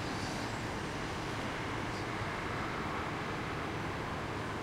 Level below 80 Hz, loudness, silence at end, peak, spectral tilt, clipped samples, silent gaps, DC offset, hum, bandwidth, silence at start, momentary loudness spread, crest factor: -52 dBFS; -38 LUFS; 0 s; -24 dBFS; -5 dB/octave; under 0.1%; none; under 0.1%; none; 16 kHz; 0 s; 1 LU; 14 dB